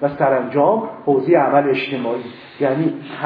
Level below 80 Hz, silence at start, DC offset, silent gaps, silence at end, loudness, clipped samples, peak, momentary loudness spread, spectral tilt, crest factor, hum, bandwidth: -64 dBFS; 0 s; under 0.1%; none; 0 s; -18 LUFS; under 0.1%; -2 dBFS; 9 LU; -10 dB/octave; 16 dB; none; 5.2 kHz